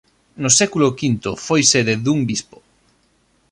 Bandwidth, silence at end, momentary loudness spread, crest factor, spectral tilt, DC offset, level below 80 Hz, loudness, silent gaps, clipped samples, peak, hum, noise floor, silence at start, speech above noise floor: 11.5 kHz; 1.1 s; 10 LU; 20 dB; -3.5 dB/octave; under 0.1%; -54 dBFS; -16 LUFS; none; under 0.1%; 0 dBFS; none; -60 dBFS; 0.4 s; 43 dB